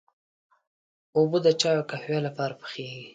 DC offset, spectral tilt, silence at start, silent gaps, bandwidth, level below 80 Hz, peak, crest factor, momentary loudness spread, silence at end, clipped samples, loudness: under 0.1%; -5 dB/octave; 1.15 s; none; 9.4 kHz; -72 dBFS; -8 dBFS; 20 dB; 14 LU; 0.05 s; under 0.1%; -25 LUFS